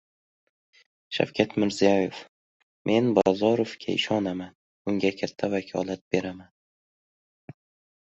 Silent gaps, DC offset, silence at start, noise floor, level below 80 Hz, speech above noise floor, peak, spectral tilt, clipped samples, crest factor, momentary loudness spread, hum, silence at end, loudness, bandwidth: 2.29-2.85 s, 4.55-4.85 s, 6.01-6.11 s; under 0.1%; 1.1 s; under -90 dBFS; -62 dBFS; over 65 dB; -4 dBFS; -5.5 dB/octave; under 0.1%; 24 dB; 14 LU; none; 1.6 s; -26 LUFS; 8.2 kHz